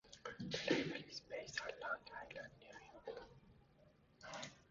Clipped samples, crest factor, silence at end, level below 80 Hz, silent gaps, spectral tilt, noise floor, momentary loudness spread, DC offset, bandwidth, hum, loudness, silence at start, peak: under 0.1%; 26 dB; 0.05 s; -74 dBFS; none; -2.5 dB/octave; -70 dBFS; 19 LU; under 0.1%; 7.4 kHz; none; -47 LUFS; 0.05 s; -22 dBFS